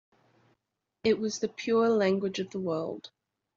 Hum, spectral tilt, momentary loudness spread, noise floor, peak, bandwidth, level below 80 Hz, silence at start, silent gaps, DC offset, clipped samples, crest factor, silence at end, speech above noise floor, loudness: none; -5 dB/octave; 9 LU; -84 dBFS; -14 dBFS; 7.6 kHz; -70 dBFS; 1.05 s; none; under 0.1%; under 0.1%; 18 dB; 0.5 s; 56 dB; -29 LUFS